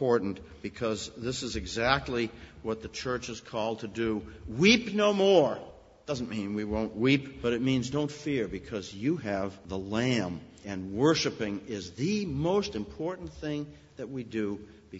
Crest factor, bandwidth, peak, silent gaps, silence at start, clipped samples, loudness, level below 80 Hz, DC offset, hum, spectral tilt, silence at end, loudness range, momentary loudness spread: 22 dB; 8 kHz; -8 dBFS; none; 0 s; under 0.1%; -30 LUFS; -52 dBFS; under 0.1%; none; -5 dB/octave; 0 s; 5 LU; 14 LU